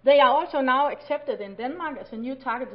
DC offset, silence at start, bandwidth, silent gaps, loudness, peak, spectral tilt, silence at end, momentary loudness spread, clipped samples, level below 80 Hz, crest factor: under 0.1%; 0.05 s; 5.4 kHz; none; -25 LUFS; -6 dBFS; -8 dB/octave; 0 s; 15 LU; under 0.1%; -60 dBFS; 16 dB